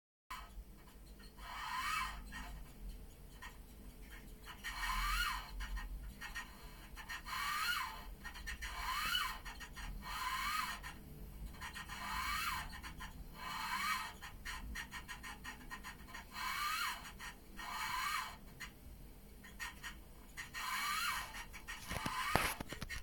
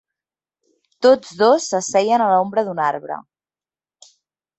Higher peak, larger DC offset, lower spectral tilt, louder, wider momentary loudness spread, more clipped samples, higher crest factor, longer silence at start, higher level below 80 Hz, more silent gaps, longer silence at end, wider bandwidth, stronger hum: second, -10 dBFS vs -2 dBFS; neither; second, -2 dB/octave vs -4 dB/octave; second, -42 LUFS vs -17 LUFS; first, 17 LU vs 10 LU; neither; first, 34 dB vs 18 dB; second, 0.3 s vs 1 s; first, -52 dBFS vs -66 dBFS; neither; second, 0 s vs 1.4 s; first, 17.5 kHz vs 8.2 kHz; neither